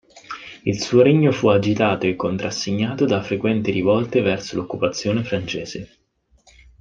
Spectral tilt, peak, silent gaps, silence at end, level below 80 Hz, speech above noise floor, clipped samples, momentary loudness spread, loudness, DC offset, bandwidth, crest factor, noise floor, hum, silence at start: -6 dB/octave; -2 dBFS; none; 0.95 s; -54 dBFS; 42 dB; under 0.1%; 12 LU; -20 LUFS; under 0.1%; 9 kHz; 18 dB; -61 dBFS; none; 0.15 s